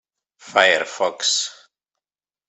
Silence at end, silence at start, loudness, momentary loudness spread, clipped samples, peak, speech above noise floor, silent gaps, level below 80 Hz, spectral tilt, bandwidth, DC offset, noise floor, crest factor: 0.95 s; 0.45 s; -19 LUFS; 8 LU; under 0.1%; 0 dBFS; over 71 dB; none; -76 dBFS; 0.5 dB/octave; 8.4 kHz; under 0.1%; under -90 dBFS; 22 dB